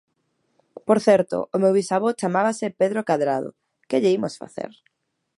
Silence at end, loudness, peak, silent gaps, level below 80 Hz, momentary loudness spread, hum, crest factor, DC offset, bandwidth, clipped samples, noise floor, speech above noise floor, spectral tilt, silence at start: 0.7 s; -21 LUFS; -4 dBFS; none; -70 dBFS; 16 LU; none; 20 dB; under 0.1%; 11.5 kHz; under 0.1%; -71 dBFS; 50 dB; -6 dB/octave; 0.85 s